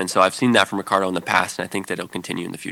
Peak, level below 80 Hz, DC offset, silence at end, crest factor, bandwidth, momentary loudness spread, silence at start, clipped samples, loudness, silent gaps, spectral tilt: 0 dBFS; -66 dBFS; under 0.1%; 0 s; 20 dB; 18 kHz; 11 LU; 0 s; under 0.1%; -21 LUFS; none; -3.5 dB/octave